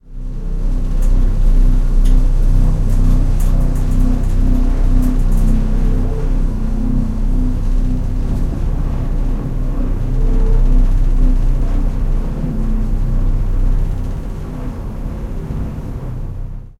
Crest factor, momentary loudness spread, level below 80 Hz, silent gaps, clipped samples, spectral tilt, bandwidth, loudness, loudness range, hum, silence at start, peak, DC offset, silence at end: 12 dB; 9 LU; -14 dBFS; none; under 0.1%; -8.5 dB/octave; 3 kHz; -20 LUFS; 5 LU; none; 0.05 s; -2 dBFS; under 0.1%; 0.1 s